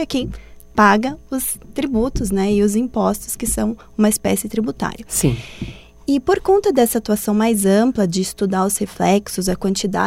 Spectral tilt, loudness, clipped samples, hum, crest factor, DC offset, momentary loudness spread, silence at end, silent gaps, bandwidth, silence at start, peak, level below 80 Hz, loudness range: -5 dB/octave; -18 LUFS; under 0.1%; none; 18 dB; under 0.1%; 9 LU; 0 s; none; 16.5 kHz; 0 s; 0 dBFS; -38 dBFS; 3 LU